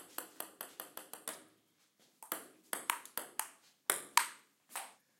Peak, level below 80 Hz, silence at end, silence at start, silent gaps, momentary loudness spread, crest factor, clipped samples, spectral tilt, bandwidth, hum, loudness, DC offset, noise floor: -6 dBFS; under -90 dBFS; 0.25 s; 0 s; none; 15 LU; 36 dB; under 0.1%; 1.5 dB/octave; 17 kHz; none; -40 LUFS; under 0.1%; -73 dBFS